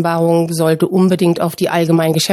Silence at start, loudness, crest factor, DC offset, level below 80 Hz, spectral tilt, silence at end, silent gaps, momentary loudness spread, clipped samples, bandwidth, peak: 0 s; -14 LUFS; 12 dB; under 0.1%; -58 dBFS; -6 dB/octave; 0 s; none; 3 LU; under 0.1%; 15.5 kHz; -2 dBFS